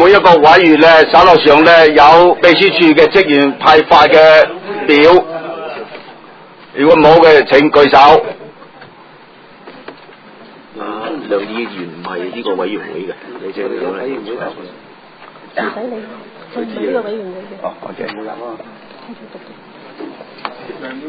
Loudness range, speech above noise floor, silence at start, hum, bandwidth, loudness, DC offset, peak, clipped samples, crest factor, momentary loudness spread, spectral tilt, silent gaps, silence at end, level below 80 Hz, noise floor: 18 LU; 30 dB; 0 s; none; 6 kHz; -8 LUFS; under 0.1%; 0 dBFS; 2%; 10 dB; 22 LU; -5.5 dB/octave; none; 0 s; -46 dBFS; -39 dBFS